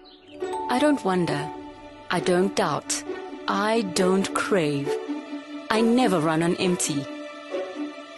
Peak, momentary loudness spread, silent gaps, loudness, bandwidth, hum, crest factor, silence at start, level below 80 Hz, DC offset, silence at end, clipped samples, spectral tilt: -2 dBFS; 14 LU; none; -24 LUFS; 12 kHz; none; 22 dB; 0.05 s; -62 dBFS; under 0.1%; 0 s; under 0.1%; -4.5 dB/octave